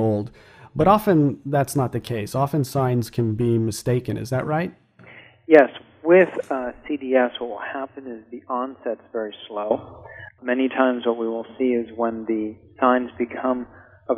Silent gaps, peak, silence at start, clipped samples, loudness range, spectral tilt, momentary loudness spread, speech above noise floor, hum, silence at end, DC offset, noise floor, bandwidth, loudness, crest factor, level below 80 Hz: none; 0 dBFS; 0 s; under 0.1%; 6 LU; -7 dB/octave; 16 LU; 26 dB; none; 0 s; under 0.1%; -47 dBFS; 15.5 kHz; -22 LUFS; 22 dB; -54 dBFS